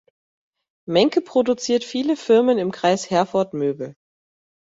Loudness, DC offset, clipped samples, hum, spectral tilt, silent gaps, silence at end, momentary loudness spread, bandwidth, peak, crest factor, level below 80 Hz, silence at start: -20 LUFS; under 0.1%; under 0.1%; none; -5 dB/octave; none; 0.8 s; 8 LU; 8 kHz; -4 dBFS; 18 dB; -64 dBFS; 0.9 s